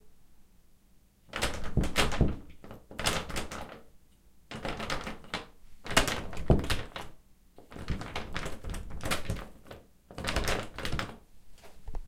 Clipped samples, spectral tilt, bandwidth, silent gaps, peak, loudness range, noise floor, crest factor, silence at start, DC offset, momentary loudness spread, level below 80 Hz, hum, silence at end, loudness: under 0.1%; -4 dB/octave; 16.5 kHz; none; -6 dBFS; 5 LU; -61 dBFS; 26 dB; 0.05 s; under 0.1%; 22 LU; -40 dBFS; none; 0 s; -34 LUFS